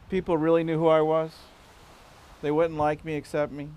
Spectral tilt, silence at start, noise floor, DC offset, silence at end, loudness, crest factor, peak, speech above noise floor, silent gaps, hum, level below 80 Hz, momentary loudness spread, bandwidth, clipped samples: -7.5 dB/octave; 0.1 s; -51 dBFS; under 0.1%; 0 s; -25 LUFS; 18 dB; -8 dBFS; 27 dB; none; none; -54 dBFS; 10 LU; 12 kHz; under 0.1%